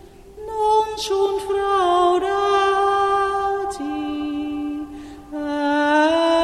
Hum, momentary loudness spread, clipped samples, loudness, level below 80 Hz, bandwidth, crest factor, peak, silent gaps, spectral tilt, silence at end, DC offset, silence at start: none; 13 LU; under 0.1%; -20 LUFS; -48 dBFS; 13 kHz; 14 dB; -6 dBFS; none; -3.5 dB/octave; 0 s; under 0.1%; 0.05 s